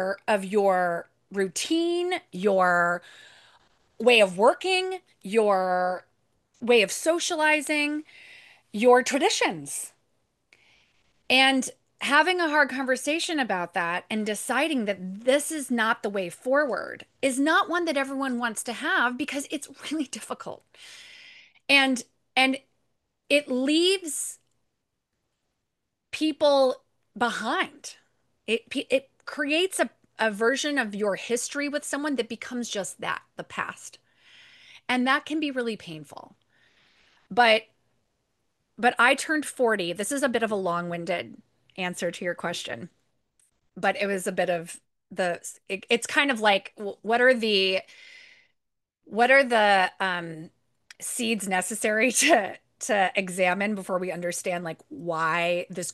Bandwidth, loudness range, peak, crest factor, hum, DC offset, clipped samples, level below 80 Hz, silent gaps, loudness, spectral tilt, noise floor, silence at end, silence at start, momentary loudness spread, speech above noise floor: 12.5 kHz; 7 LU; -4 dBFS; 22 dB; none; under 0.1%; under 0.1%; -76 dBFS; none; -25 LUFS; -3 dB/octave; -82 dBFS; 0 s; 0 s; 15 LU; 57 dB